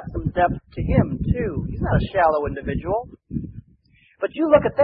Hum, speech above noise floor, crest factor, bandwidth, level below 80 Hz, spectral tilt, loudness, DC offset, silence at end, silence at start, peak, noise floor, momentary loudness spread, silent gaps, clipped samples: none; 36 dB; 20 dB; 5.2 kHz; -34 dBFS; -12.5 dB/octave; -22 LUFS; under 0.1%; 0 s; 0 s; -2 dBFS; -57 dBFS; 14 LU; none; under 0.1%